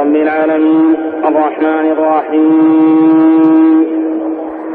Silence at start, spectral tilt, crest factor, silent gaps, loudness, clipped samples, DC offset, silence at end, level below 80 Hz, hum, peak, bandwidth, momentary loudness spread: 0 s; -10 dB/octave; 10 dB; none; -10 LUFS; under 0.1%; under 0.1%; 0 s; -58 dBFS; none; 0 dBFS; 3.7 kHz; 7 LU